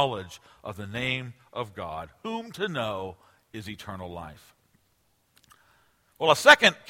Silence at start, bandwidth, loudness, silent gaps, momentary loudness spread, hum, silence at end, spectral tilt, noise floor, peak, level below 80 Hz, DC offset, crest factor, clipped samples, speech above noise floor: 0 s; 16.5 kHz; -25 LUFS; none; 24 LU; none; 0.15 s; -3 dB/octave; -69 dBFS; 0 dBFS; -62 dBFS; under 0.1%; 28 dB; under 0.1%; 43 dB